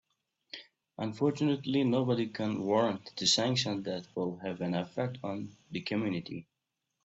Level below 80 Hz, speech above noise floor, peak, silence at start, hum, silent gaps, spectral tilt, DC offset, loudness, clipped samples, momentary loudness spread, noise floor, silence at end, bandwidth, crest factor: -72 dBFS; 54 dB; -14 dBFS; 0.55 s; none; none; -5 dB/octave; under 0.1%; -32 LUFS; under 0.1%; 16 LU; -85 dBFS; 0.65 s; 8.2 kHz; 20 dB